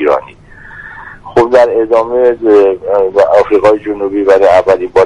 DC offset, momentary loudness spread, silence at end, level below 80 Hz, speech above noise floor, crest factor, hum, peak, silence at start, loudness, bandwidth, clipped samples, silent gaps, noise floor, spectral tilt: under 0.1%; 17 LU; 0 s; -42 dBFS; 25 dB; 10 dB; none; 0 dBFS; 0 s; -9 LUFS; 10 kHz; 0.4%; none; -34 dBFS; -6 dB/octave